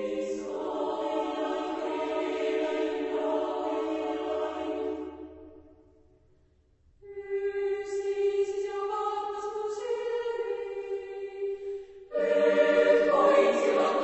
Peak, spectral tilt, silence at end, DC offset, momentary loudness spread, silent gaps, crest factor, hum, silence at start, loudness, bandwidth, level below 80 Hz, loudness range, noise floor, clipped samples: -12 dBFS; -4.5 dB/octave; 0 s; under 0.1%; 14 LU; none; 18 dB; none; 0 s; -29 LUFS; 8.4 kHz; -66 dBFS; 11 LU; -64 dBFS; under 0.1%